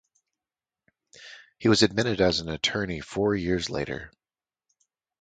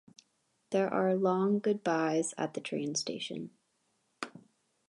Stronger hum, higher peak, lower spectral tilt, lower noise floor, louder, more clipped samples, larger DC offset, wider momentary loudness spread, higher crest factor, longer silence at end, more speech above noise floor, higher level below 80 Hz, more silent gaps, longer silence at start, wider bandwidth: neither; first, -4 dBFS vs -16 dBFS; about the same, -4.5 dB/octave vs -4.5 dB/octave; first, under -90 dBFS vs -76 dBFS; first, -25 LUFS vs -32 LUFS; neither; neither; about the same, 17 LU vs 15 LU; first, 24 dB vs 18 dB; first, 1.1 s vs 0.5 s; first, over 65 dB vs 45 dB; first, -50 dBFS vs -82 dBFS; neither; first, 1.15 s vs 0.7 s; second, 9.4 kHz vs 11.5 kHz